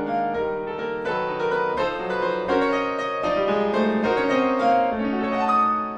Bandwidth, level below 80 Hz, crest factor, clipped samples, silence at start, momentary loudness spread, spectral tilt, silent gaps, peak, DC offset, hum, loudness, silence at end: 9.2 kHz; -52 dBFS; 14 dB; under 0.1%; 0 s; 6 LU; -6 dB/octave; none; -8 dBFS; under 0.1%; none; -23 LUFS; 0 s